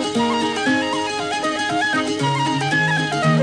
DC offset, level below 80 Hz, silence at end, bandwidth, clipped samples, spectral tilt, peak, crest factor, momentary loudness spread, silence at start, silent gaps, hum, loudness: 0.1%; -56 dBFS; 0 s; 10.5 kHz; under 0.1%; -4.5 dB/octave; -6 dBFS; 14 dB; 4 LU; 0 s; none; none; -19 LUFS